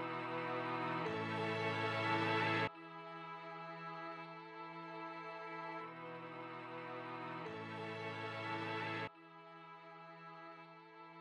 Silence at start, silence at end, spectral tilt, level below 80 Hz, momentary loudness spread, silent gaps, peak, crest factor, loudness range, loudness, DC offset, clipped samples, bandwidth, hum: 0 s; 0 s; -6 dB/octave; under -90 dBFS; 18 LU; none; -26 dBFS; 18 dB; 9 LU; -43 LUFS; under 0.1%; under 0.1%; 11.5 kHz; none